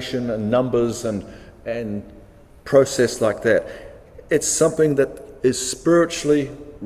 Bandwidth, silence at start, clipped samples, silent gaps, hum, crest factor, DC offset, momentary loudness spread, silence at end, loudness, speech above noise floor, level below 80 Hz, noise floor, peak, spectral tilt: 16 kHz; 0 s; under 0.1%; none; none; 18 dB; under 0.1%; 14 LU; 0 s; -20 LUFS; 23 dB; -48 dBFS; -43 dBFS; -2 dBFS; -4.5 dB/octave